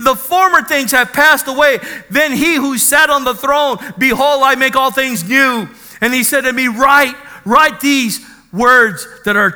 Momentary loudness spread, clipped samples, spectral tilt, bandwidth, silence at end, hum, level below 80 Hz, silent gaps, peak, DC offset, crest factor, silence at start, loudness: 8 LU; 0.3%; -2.5 dB/octave; over 20 kHz; 0 s; none; -46 dBFS; none; 0 dBFS; under 0.1%; 12 dB; 0 s; -11 LUFS